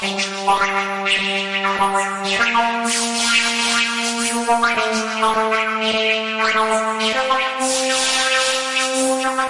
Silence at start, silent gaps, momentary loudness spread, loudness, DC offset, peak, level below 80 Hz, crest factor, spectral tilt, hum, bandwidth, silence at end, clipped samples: 0 s; none; 4 LU; -17 LUFS; 0.2%; -6 dBFS; -58 dBFS; 14 dB; -1 dB/octave; none; 11.5 kHz; 0 s; under 0.1%